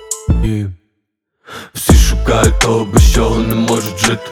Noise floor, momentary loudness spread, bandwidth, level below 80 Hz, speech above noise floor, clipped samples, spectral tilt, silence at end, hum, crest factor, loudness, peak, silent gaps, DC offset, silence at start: -70 dBFS; 14 LU; 19 kHz; -16 dBFS; 58 dB; under 0.1%; -5 dB/octave; 0 s; none; 12 dB; -13 LUFS; 0 dBFS; none; under 0.1%; 0 s